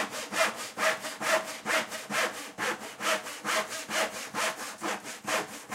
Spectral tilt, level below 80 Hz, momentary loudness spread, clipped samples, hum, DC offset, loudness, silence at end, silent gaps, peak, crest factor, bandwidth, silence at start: -1 dB/octave; -76 dBFS; 5 LU; under 0.1%; none; under 0.1%; -31 LUFS; 0 s; none; -12 dBFS; 20 dB; 16 kHz; 0 s